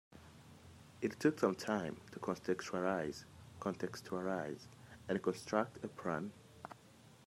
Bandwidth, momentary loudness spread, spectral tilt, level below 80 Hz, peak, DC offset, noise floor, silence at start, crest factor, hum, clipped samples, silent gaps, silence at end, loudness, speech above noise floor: 16 kHz; 23 LU; -5.5 dB/octave; -76 dBFS; -18 dBFS; under 0.1%; -62 dBFS; 0.1 s; 24 dB; none; under 0.1%; none; 0.05 s; -40 LUFS; 23 dB